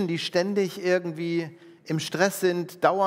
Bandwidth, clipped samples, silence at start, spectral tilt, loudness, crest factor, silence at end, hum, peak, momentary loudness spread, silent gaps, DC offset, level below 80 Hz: 16 kHz; under 0.1%; 0 s; -5 dB/octave; -26 LUFS; 20 dB; 0 s; none; -6 dBFS; 7 LU; none; under 0.1%; -80 dBFS